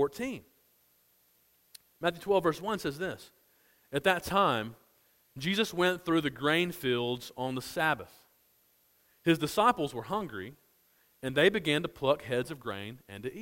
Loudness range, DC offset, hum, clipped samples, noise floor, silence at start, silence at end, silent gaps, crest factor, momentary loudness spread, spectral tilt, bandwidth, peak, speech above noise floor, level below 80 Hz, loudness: 4 LU; under 0.1%; none; under 0.1%; -68 dBFS; 0 s; 0 s; none; 22 dB; 14 LU; -5 dB/octave; 16.5 kHz; -10 dBFS; 38 dB; -64 dBFS; -31 LUFS